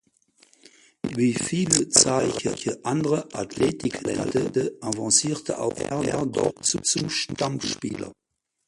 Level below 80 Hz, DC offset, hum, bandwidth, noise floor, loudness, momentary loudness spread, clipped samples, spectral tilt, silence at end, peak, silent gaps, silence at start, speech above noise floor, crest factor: -56 dBFS; under 0.1%; none; 11.5 kHz; -61 dBFS; -24 LUFS; 10 LU; under 0.1%; -3.5 dB/octave; 0.55 s; 0 dBFS; none; 1.05 s; 37 dB; 26 dB